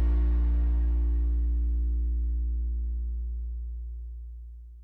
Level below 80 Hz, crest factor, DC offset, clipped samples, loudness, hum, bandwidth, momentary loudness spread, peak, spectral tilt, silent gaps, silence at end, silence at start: -26 dBFS; 8 dB; under 0.1%; under 0.1%; -30 LUFS; none; 2 kHz; 15 LU; -18 dBFS; -11 dB/octave; none; 0 s; 0 s